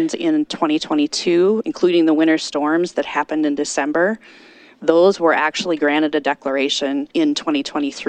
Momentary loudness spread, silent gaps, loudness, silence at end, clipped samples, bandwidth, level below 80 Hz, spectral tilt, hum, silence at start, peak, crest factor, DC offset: 6 LU; none; -18 LUFS; 0 s; under 0.1%; 9.4 kHz; -64 dBFS; -4 dB/octave; none; 0 s; 0 dBFS; 18 dB; under 0.1%